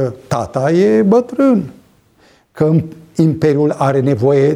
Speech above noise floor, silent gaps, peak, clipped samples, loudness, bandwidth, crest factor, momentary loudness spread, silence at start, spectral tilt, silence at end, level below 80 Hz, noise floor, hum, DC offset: 38 dB; none; 0 dBFS; under 0.1%; -14 LUFS; 12.5 kHz; 12 dB; 7 LU; 0 s; -8.5 dB/octave; 0 s; -50 dBFS; -51 dBFS; none; under 0.1%